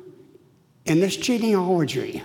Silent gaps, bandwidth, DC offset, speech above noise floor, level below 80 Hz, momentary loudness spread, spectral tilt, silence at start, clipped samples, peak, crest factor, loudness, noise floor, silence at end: none; 18 kHz; under 0.1%; 35 dB; -62 dBFS; 4 LU; -5.5 dB/octave; 0.05 s; under 0.1%; -10 dBFS; 14 dB; -22 LUFS; -57 dBFS; 0 s